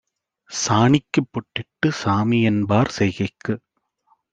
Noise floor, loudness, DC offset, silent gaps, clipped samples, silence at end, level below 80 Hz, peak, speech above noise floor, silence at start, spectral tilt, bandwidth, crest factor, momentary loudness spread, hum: -64 dBFS; -21 LUFS; under 0.1%; none; under 0.1%; 0.75 s; -56 dBFS; -2 dBFS; 45 dB; 0.5 s; -5.5 dB/octave; 9.2 kHz; 18 dB; 12 LU; none